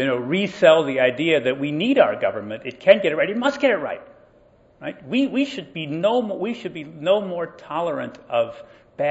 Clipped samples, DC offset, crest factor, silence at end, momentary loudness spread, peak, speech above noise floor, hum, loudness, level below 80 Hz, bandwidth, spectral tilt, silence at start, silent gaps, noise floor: under 0.1%; under 0.1%; 22 dB; 0 s; 14 LU; 0 dBFS; 33 dB; none; -21 LUFS; -64 dBFS; 8 kHz; -6 dB/octave; 0 s; none; -54 dBFS